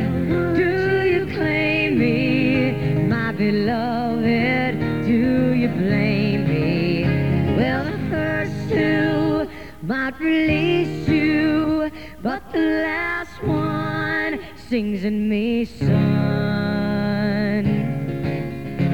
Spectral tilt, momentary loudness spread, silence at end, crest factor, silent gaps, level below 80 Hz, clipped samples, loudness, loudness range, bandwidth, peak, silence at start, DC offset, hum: -8 dB/octave; 7 LU; 0 s; 14 dB; none; -42 dBFS; under 0.1%; -20 LUFS; 3 LU; 18 kHz; -6 dBFS; 0 s; 0.7%; none